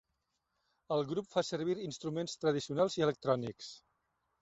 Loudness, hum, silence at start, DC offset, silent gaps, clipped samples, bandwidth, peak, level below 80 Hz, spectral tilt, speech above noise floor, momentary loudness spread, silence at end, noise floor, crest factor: -35 LUFS; none; 0.9 s; under 0.1%; none; under 0.1%; 8.2 kHz; -16 dBFS; -74 dBFS; -5.5 dB/octave; 49 dB; 8 LU; 0.65 s; -83 dBFS; 20 dB